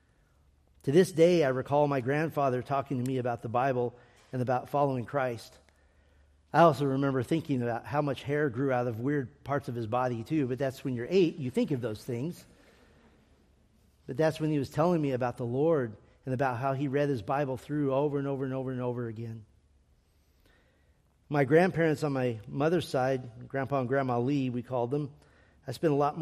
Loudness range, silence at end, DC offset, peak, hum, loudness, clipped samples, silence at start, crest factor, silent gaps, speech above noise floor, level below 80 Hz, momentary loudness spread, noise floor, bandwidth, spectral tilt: 5 LU; 0 s; under 0.1%; -8 dBFS; none; -30 LUFS; under 0.1%; 0.85 s; 22 dB; none; 37 dB; -64 dBFS; 11 LU; -66 dBFS; 14.5 kHz; -7.5 dB/octave